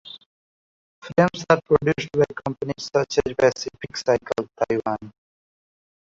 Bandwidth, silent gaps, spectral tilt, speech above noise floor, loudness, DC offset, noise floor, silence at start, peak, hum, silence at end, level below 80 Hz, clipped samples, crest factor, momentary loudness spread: 7.8 kHz; 0.26-1.02 s; -5.5 dB/octave; over 68 dB; -23 LUFS; under 0.1%; under -90 dBFS; 0.05 s; -2 dBFS; none; 1 s; -52 dBFS; under 0.1%; 22 dB; 11 LU